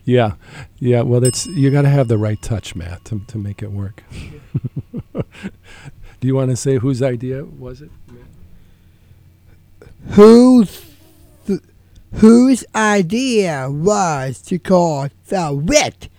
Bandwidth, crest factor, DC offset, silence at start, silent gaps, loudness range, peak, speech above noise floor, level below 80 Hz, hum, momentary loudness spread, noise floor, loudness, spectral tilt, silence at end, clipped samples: 16.5 kHz; 16 dB; under 0.1%; 0.05 s; none; 14 LU; 0 dBFS; 32 dB; -42 dBFS; none; 21 LU; -47 dBFS; -15 LUFS; -6 dB/octave; 0.1 s; under 0.1%